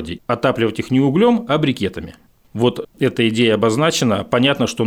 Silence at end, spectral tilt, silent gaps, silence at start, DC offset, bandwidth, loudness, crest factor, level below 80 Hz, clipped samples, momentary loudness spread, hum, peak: 0 s; -5.5 dB/octave; none; 0 s; under 0.1%; 16.5 kHz; -17 LUFS; 14 dB; -52 dBFS; under 0.1%; 8 LU; none; -4 dBFS